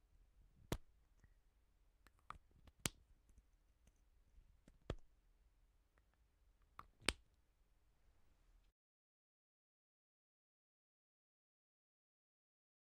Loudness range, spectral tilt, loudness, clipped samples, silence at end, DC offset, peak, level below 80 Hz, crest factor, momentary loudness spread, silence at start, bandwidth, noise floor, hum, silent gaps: 11 LU; -2.5 dB/octave; -48 LUFS; under 0.1%; 4.35 s; under 0.1%; -12 dBFS; -66 dBFS; 46 dB; 19 LU; 0.2 s; 9.4 kHz; -77 dBFS; none; none